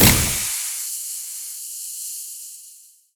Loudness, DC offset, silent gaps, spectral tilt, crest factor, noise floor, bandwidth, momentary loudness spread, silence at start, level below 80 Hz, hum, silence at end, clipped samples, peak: -23 LUFS; under 0.1%; none; -2.5 dB/octave; 24 dB; -48 dBFS; over 20 kHz; 16 LU; 0 s; -38 dBFS; none; 0.35 s; under 0.1%; 0 dBFS